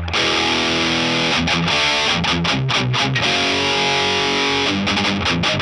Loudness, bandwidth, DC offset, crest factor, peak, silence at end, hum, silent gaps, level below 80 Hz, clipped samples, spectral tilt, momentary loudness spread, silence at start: -16 LUFS; 12 kHz; under 0.1%; 14 dB; -4 dBFS; 0 s; none; none; -40 dBFS; under 0.1%; -3.5 dB/octave; 2 LU; 0 s